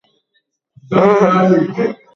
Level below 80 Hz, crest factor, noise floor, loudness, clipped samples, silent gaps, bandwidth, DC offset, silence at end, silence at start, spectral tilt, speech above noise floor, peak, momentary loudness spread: -56 dBFS; 14 dB; -66 dBFS; -13 LUFS; under 0.1%; none; 7 kHz; under 0.1%; 0.2 s; 0.9 s; -8 dB/octave; 54 dB; 0 dBFS; 8 LU